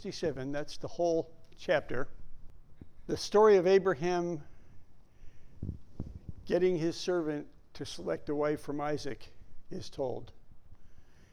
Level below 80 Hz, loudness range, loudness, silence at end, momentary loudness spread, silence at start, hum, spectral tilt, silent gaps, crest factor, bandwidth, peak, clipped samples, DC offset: -52 dBFS; 8 LU; -31 LUFS; 0.1 s; 20 LU; 0 s; none; -5.5 dB/octave; none; 18 dB; 12 kHz; -14 dBFS; under 0.1%; under 0.1%